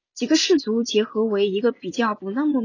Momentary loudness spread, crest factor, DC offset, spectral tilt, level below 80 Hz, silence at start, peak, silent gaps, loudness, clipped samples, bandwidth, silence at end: 6 LU; 14 dB; under 0.1%; -4 dB/octave; -70 dBFS; 0.15 s; -8 dBFS; none; -21 LUFS; under 0.1%; 7.6 kHz; 0 s